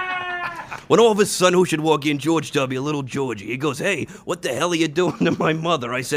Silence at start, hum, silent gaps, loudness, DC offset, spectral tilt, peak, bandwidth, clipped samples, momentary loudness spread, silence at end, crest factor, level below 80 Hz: 0 s; none; none; -20 LUFS; under 0.1%; -4.5 dB/octave; -2 dBFS; 15.5 kHz; under 0.1%; 10 LU; 0 s; 18 dB; -58 dBFS